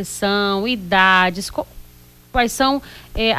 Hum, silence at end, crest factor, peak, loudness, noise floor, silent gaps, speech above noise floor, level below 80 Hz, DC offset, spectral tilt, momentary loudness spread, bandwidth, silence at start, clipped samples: 60 Hz at -45 dBFS; 0 s; 16 dB; -2 dBFS; -17 LUFS; -46 dBFS; none; 27 dB; -38 dBFS; under 0.1%; -3.5 dB/octave; 14 LU; 16 kHz; 0 s; under 0.1%